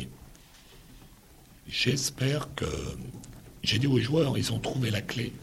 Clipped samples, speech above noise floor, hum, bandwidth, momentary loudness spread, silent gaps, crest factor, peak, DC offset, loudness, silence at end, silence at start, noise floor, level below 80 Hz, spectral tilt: under 0.1%; 26 dB; none; 16 kHz; 17 LU; none; 18 dB; -12 dBFS; under 0.1%; -29 LUFS; 0 s; 0 s; -54 dBFS; -50 dBFS; -4.5 dB/octave